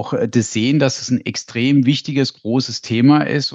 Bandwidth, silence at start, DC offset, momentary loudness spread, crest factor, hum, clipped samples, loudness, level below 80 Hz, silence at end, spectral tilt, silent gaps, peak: 8 kHz; 0 s; under 0.1%; 7 LU; 16 dB; none; under 0.1%; -17 LUFS; -62 dBFS; 0 s; -5.5 dB/octave; none; 0 dBFS